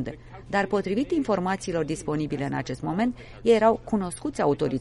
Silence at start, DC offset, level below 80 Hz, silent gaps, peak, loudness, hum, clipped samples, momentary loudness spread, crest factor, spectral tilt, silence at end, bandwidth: 0 s; under 0.1%; -50 dBFS; none; -8 dBFS; -26 LUFS; none; under 0.1%; 9 LU; 18 dB; -6 dB/octave; 0 s; 11.5 kHz